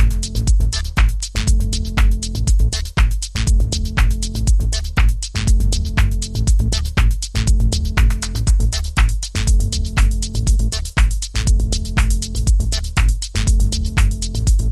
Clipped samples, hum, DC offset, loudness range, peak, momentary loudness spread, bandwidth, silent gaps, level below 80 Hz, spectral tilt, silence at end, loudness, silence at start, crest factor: under 0.1%; none; under 0.1%; 1 LU; -2 dBFS; 3 LU; 13.5 kHz; none; -16 dBFS; -4 dB/octave; 0 s; -19 LUFS; 0 s; 12 dB